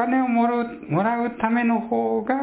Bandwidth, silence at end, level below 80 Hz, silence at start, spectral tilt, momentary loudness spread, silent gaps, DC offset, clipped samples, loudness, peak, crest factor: 4 kHz; 0 s; -60 dBFS; 0 s; -11 dB/octave; 3 LU; none; under 0.1%; under 0.1%; -22 LUFS; -8 dBFS; 14 dB